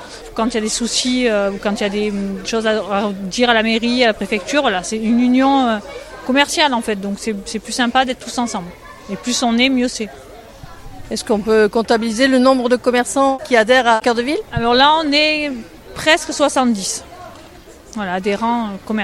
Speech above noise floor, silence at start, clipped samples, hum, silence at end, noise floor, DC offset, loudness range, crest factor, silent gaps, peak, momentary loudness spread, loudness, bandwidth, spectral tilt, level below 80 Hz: 24 dB; 0 s; under 0.1%; none; 0 s; -40 dBFS; under 0.1%; 5 LU; 16 dB; none; 0 dBFS; 14 LU; -16 LUFS; 14 kHz; -3.5 dB/octave; -44 dBFS